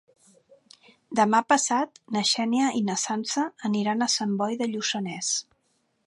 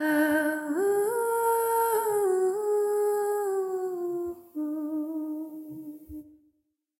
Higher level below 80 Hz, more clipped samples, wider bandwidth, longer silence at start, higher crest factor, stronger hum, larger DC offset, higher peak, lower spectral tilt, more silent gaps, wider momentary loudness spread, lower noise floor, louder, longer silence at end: second, -78 dBFS vs -68 dBFS; neither; second, 11.5 kHz vs 16.5 kHz; first, 1.1 s vs 0 s; first, 20 dB vs 14 dB; neither; neither; first, -8 dBFS vs -14 dBFS; about the same, -3 dB/octave vs -4 dB/octave; neither; second, 6 LU vs 16 LU; second, -71 dBFS vs -75 dBFS; first, -25 LUFS vs -28 LUFS; about the same, 0.65 s vs 0.7 s